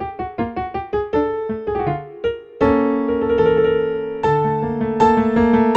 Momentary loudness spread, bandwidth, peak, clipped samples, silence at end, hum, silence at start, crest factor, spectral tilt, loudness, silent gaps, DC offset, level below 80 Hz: 10 LU; 8 kHz; -2 dBFS; under 0.1%; 0 s; none; 0 s; 16 dB; -8 dB/octave; -19 LUFS; none; under 0.1%; -40 dBFS